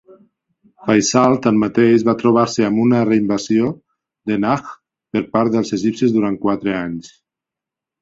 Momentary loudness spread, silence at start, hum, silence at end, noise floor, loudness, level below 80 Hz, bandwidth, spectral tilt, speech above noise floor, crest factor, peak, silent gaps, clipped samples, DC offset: 10 LU; 0.8 s; none; 0.95 s; -86 dBFS; -17 LUFS; -54 dBFS; 7.8 kHz; -5.5 dB/octave; 70 dB; 16 dB; -2 dBFS; none; under 0.1%; under 0.1%